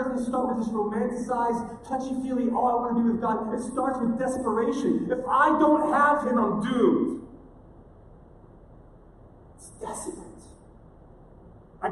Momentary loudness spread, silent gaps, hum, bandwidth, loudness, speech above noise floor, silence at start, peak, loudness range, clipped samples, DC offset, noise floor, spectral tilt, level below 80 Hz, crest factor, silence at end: 14 LU; none; none; 12 kHz; -25 LUFS; 26 dB; 0 s; -8 dBFS; 20 LU; under 0.1%; under 0.1%; -51 dBFS; -6 dB/octave; -54 dBFS; 18 dB; 0 s